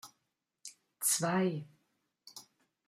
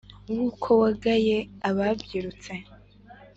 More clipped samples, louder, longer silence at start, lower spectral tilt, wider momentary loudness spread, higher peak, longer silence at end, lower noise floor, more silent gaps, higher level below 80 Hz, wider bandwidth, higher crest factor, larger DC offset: neither; second, -32 LUFS vs -25 LUFS; second, 0.05 s vs 0.3 s; second, -3.5 dB/octave vs -6.5 dB/octave; first, 22 LU vs 16 LU; second, -16 dBFS vs -8 dBFS; first, 0.45 s vs 0.1 s; first, -84 dBFS vs -50 dBFS; neither; second, -84 dBFS vs -52 dBFS; first, 16 kHz vs 8 kHz; about the same, 22 dB vs 18 dB; neither